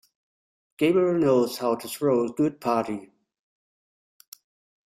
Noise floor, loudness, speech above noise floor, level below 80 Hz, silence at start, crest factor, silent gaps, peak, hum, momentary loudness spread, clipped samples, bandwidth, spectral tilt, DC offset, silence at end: under -90 dBFS; -24 LUFS; over 67 dB; -68 dBFS; 0.8 s; 18 dB; none; -8 dBFS; none; 6 LU; under 0.1%; 16 kHz; -6 dB/octave; under 0.1%; 1.8 s